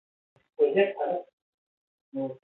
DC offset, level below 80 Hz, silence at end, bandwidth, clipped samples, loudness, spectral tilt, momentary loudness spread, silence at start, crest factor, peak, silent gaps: under 0.1%; -84 dBFS; 0.05 s; 4.1 kHz; under 0.1%; -27 LUFS; -9 dB/octave; 12 LU; 0.6 s; 18 dB; -12 dBFS; 1.33-2.12 s